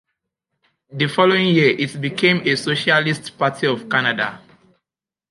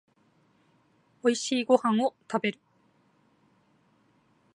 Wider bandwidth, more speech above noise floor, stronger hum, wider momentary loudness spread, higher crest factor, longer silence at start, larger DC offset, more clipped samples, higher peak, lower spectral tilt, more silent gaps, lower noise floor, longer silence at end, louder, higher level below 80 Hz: about the same, 11.5 kHz vs 11 kHz; first, 70 dB vs 40 dB; neither; about the same, 8 LU vs 8 LU; second, 18 dB vs 24 dB; second, 0.9 s vs 1.25 s; neither; neither; first, -2 dBFS vs -8 dBFS; first, -5.5 dB/octave vs -4 dB/octave; neither; first, -88 dBFS vs -66 dBFS; second, 0.95 s vs 2.05 s; first, -18 LUFS vs -27 LUFS; first, -64 dBFS vs -84 dBFS